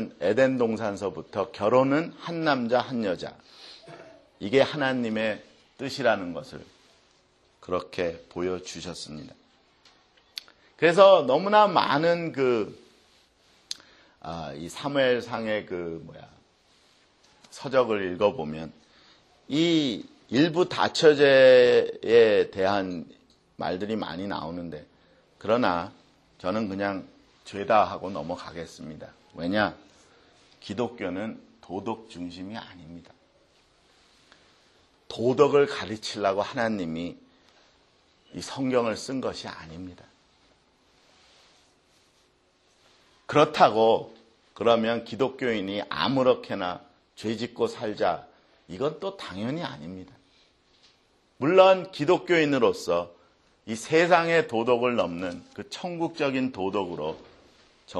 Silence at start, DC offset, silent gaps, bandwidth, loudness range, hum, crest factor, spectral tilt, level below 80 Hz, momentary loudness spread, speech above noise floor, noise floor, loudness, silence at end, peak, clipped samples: 0 s; under 0.1%; none; 12 kHz; 13 LU; none; 24 dB; -5.5 dB/octave; -64 dBFS; 21 LU; 40 dB; -65 dBFS; -25 LUFS; 0 s; -2 dBFS; under 0.1%